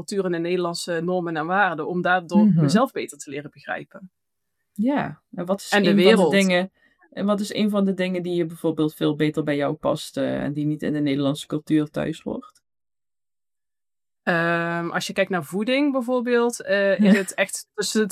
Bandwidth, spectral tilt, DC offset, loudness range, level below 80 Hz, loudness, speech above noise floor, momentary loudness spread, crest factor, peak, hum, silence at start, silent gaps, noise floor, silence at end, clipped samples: 14.5 kHz; -5.5 dB/octave; under 0.1%; 6 LU; -64 dBFS; -22 LUFS; over 68 dB; 14 LU; 22 dB; 0 dBFS; none; 0 s; none; under -90 dBFS; 0 s; under 0.1%